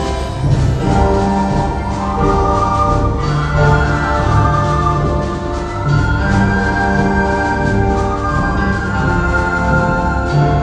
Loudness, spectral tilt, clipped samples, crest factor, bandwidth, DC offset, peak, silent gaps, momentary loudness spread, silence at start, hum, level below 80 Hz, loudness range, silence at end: -15 LUFS; -7 dB/octave; under 0.1%; 14 dB; 9.6 kHz; under 0.1%; 0 dBFS; none; 4 LU; 0 s; none; -20 dBFS; 1 LU; 0 s